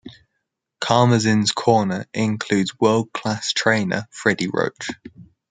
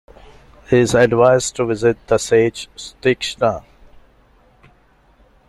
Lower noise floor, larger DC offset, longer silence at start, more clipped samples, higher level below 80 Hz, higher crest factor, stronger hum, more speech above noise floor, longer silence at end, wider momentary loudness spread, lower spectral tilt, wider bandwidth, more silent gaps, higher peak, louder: first, -77 dBFS vs -53 dBFS; neither; second, 0.05 s vs 0.7 s; neither; second, -60 dBFS vs -46 dBFS; about the same, 20 dB vs 18 dB; neither; first, 57 dB vs 37 dB; second, 0.3 s vs 1.9 s; about the same, 9 LU vs 8 LU; about the same, -5 dB/octave vs -5 dB/octave; second, 9.6 kHz vs 12.5 kHz; neither; about the same, -2 dBFS vs 0 dBFS; second, -20 LUFS vs -16 LUFS